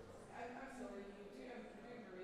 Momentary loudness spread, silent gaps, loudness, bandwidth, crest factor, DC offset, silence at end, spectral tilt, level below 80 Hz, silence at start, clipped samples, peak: 4 LU; none; -53 LUFS; 14 kHz; 14 dB; under 0.1%; 0 s; -5.5 dB/octave; -72 dBFS; 0 s; under 0.1%; -40 dBFS